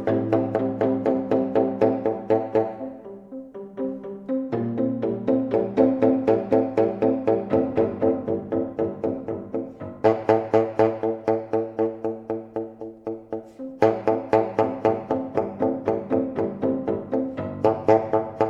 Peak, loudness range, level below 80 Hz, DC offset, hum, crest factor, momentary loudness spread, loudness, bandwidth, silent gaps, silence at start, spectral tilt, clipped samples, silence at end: -2 dBFS; 5 LU; -58 dBFS; under 0.1%; none; 20 dB; 13 LU; -24 LUFS; 7.2 kHz; none; 0 s; -9 dB/octave; under 0.1%; 0 s